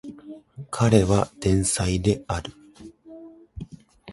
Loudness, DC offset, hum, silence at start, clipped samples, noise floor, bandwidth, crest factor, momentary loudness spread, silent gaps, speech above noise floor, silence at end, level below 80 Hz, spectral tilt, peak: -22 LUFS; under 0.1%; none; 0.05 s; under 0.1%; -46 dBFS; 11.5 kHz; 22 dB; 25 LU; none; 25 dB; 0 s; -40 dBFS; -5.5 dB/octave; -2 dBFS